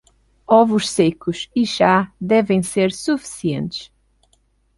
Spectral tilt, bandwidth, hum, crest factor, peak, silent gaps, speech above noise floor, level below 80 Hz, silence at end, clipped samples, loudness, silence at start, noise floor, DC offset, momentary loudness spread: -5 dB/octave; 11.5 kHz; none; 18 dB; -2 dBFS; none; 44 dB; -54 dBFS; 0.9 s; under 0.1%; -18 LUFS; 0.5 s; -61 dBFS; under 0.1%; 10 LU